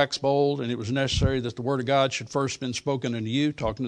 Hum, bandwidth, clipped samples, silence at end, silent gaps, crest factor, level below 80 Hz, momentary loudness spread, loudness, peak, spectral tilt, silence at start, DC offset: none; 10.5 kHz; under 0.1%; 0 s; none; 20 dB; -42 dBFS; 5 LU; -26 LUFS; -6 dBFS; -5 dB/octave; 0 s; under 0.1%